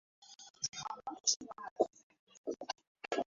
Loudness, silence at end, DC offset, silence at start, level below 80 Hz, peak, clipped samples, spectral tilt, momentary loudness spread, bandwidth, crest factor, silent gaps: -39 LUFS; 0.05 s; under 0.1%; 0.2 s; -82 dBFS; -16 dBFS; under 0.1%; -1 dB/octave; 17 LU; 7.6 kHz; 26 dB; 0.50-0.54 s, 1.36-1.40 s, 1.71-1.76 s, 2.03-2.10 s, 2.19-2.27 s, 2.37-2.44 s, 2.87-2.95 s